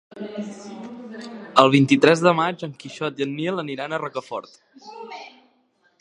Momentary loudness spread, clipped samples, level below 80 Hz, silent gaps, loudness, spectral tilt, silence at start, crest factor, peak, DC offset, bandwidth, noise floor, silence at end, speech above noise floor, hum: 22 LU; under 0.1%; -70 dBFS; none; -20 LUFS; -5.5 dB/octave; 0.15 s; 22 dB; 0 dBFS; under 0.1%; 10.5 kHz; -64 dBFS; 0.75 s; 42 dB; none